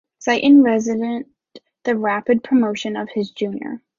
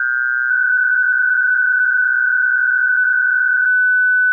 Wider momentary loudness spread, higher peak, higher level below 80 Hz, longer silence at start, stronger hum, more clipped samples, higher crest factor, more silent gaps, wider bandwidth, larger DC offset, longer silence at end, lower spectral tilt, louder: first, 15 LU vs 2 LU; first, -4 dBFS vs -10 dBFS; first, -64 dBFS vs -86 dBFS; first, 0.2 s vs 0 s; neither; neither; first, 16 dB vs 4 dB; neither; first, 7.2 kHz vs 2.1 kHz; neither; first, 0.2 s vs 0 s; first, -5 dB/octave vs 0.5 dB/octave; second, -18 LUFS vs -13 LUFS